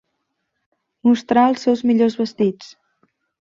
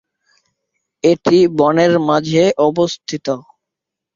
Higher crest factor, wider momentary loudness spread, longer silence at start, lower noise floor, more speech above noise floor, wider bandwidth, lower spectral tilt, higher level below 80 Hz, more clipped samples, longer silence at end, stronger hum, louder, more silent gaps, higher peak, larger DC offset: about the same, 18 dB vs 16 dB; second, 6 LU vs 11 LU; about the same, 1.05 s vs 1.05 s; second, -74 dBFS vs -82 dBFS; second, 57 dB vs 69 dB; about the same, 7.4 kHz vs 7.6 kHz; about the same, -6.5 dB/octave vs -6 dB/octave; second, -64 dBFS vs -56 dBFS; neither; about the same, 0.85 s vs 0.75 s; neither; second, -18 LUFS vs -15 LUFS; neither; about the same, -2 dBFS vs 0 dBFS; neither